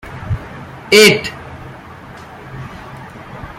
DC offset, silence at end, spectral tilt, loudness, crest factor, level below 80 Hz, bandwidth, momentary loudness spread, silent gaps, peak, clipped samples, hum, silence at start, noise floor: under 0.1%; 0.05 s; -3.5 dB/octave; -11 LUFS; 18 dB; -40 dBFS; 16 kHz; 27 LU; none; 0 dBFS; under 0.1%; none; 0.05 s; -35 dBFS